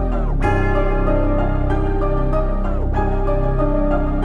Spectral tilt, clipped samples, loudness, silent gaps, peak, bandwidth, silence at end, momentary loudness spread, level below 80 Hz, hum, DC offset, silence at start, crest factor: -9.5 dB/octave; under 0.1%; -20 LUFS; none; -4 dBFS; 3.7 kHz; 0 s; 3 LU; -18 dBFS; none; under 0.1%; 0 s; 12 dB